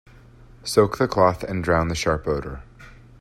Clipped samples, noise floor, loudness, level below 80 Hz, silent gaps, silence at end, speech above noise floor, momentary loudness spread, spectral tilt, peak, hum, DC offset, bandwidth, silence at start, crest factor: under 0.1%; -47 dBFS; -22 LUFS; -42 dBFS; none; 0.3 s; 26 dB; 15 LU; -5.5 dB/octave; -4 dBFS; none; under 0.1%; 15 kHz; 0.4 s; 20 dB